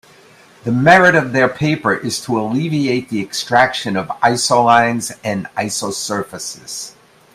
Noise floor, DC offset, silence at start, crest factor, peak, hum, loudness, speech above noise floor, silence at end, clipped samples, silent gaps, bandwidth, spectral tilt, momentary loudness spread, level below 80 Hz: -46 dBFS; under 0.1%; 0.65 s; 16 dB; 0 dBFS; none; -15 LUFS; 30 dB; 0.45 s; under 0.1%; none; 16 kHz; -4 dB/octave; 15 LU; -56 dBFS